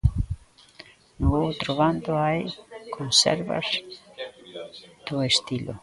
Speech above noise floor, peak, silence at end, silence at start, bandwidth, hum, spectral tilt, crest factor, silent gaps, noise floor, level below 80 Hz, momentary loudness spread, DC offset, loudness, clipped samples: 26 dB; -6 dBFS; 0.05 s; 0.05 s; 11.5 kHz; none; -4 dB/octave; 22 dB; none; -50 dBFS; -38 dBFS; 20 LU; under 0.1%; -24 LUFS; under 0.1%